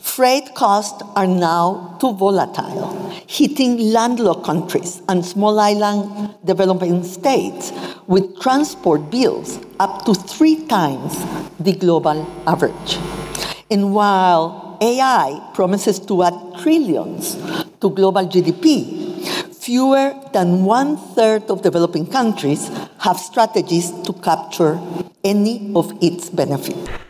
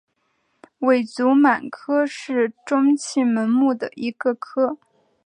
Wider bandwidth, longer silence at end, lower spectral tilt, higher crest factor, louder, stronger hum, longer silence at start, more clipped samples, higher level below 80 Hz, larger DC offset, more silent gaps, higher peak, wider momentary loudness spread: first, 16 kHz vs 10 kHz; second, 0.05 s vs 0.5 s; about the same, -5.5 dB/octave vs -5 dB/octave; about the same, 16 dB vs 18 dB; first, -17 LUFS vs -20 LUFS; neither; second, 0.05 s vs 0.8 s; neither; first, -52 dBFS vs -76 dBFS; neither; neither; about the same, -2 dBFS vs -4 dBFS; about the same, 10 LU vs 8 LU